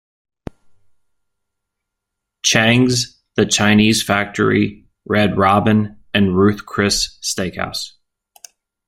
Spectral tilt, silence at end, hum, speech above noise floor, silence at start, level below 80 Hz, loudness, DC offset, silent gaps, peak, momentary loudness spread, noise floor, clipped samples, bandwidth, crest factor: -4 dB/octave; 1 s; none; 64 dB; 2.45 s; -46 dBFS; -16 LUFS; under 0.1%; none; 0 dBFS; 10 LU; -79 dBFS; under 0.1%; 16 kHz; 18 dB